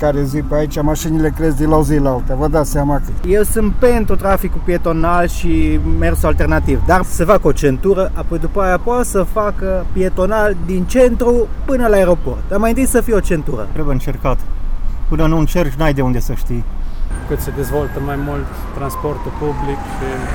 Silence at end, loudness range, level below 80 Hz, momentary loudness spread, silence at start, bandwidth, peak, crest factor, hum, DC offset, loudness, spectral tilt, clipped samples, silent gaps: 0 s; 5 LU; -18 dBFS; 9 LU; 0 s; 18.5 kHz; 0 dBFS; 14 dB; none; under 0.1%; -16 LUFS; -6.5 dB/octave; under 0.1%; none